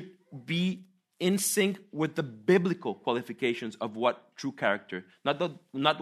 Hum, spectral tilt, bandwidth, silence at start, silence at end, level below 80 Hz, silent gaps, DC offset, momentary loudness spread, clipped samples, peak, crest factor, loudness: none; -4.5 dB/octave; 13.5 kHz; 0 s; 0 s; -78 dBFS; none; under 0.1%; 11 LU; under 0.1%; -8 dBFS; 22 dB; -30 LUFS